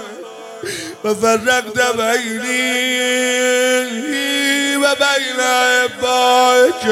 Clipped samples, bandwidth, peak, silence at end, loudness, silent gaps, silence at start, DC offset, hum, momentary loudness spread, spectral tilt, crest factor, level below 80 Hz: under 0.1%; 16.5 kHz; -2 dBFS; 0 s; -15 LUFS; none; 0 s; under 0.1%; none; 12 LU; -1.5 dB/octave; 14 dB; -62 dBFS